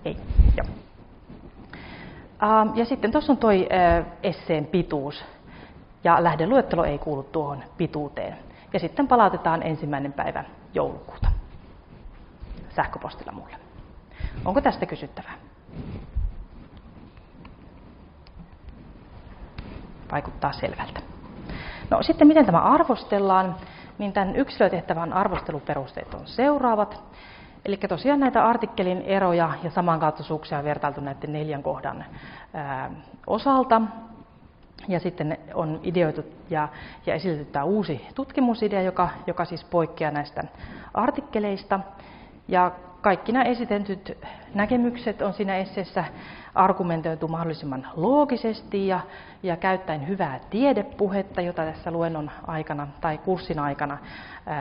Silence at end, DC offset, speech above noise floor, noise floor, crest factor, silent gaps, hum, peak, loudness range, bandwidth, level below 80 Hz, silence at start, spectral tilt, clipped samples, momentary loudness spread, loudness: 0 s; under 0.1%; 27 dB; -51 dBFS; 22 dB; none; none; -4 dBFS; 10 LU; 5.4 kHz; -38 dBFS; 0 s; -5.5 dB/octave; under 0.1%; 20 LU; -24 LUFS